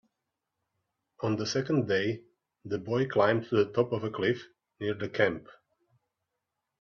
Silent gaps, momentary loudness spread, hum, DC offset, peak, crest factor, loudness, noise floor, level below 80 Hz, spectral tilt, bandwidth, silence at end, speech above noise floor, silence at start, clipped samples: none; 11 LU; none; under 0.1%; -10 dBFS; 22 dB; -30 LUFS; -85 dBFS; -70 dBFS; -6 dB/octave; 7.2 kHz; 1.3 s; 56 dB; 1.2 s; under 0.1%